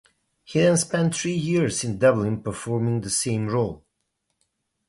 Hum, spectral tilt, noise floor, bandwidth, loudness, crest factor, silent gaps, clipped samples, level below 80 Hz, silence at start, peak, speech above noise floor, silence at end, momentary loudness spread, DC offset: none; -5 dB/octave; -76 dBFS; 11.5 kHz; -23 LUFS; 18 dB; none; under 0.1%; -54 dBFS; 0.5 s; -6 dBFS; 54 dB; 1.1 s; 8 LU; under 0.1%